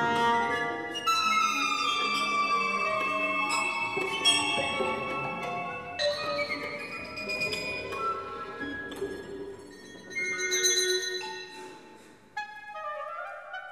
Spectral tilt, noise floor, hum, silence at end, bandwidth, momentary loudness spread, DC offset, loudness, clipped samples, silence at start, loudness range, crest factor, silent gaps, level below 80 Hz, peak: -1.5 dB/octave; -53 dBFS; none; 0 s; 14 kHz; 15 LU; under 0.1%; -28 LUFS; under 0.1%; 0 s; 7 LU; 18 dB; none; -64 dBFS; -12 dBFS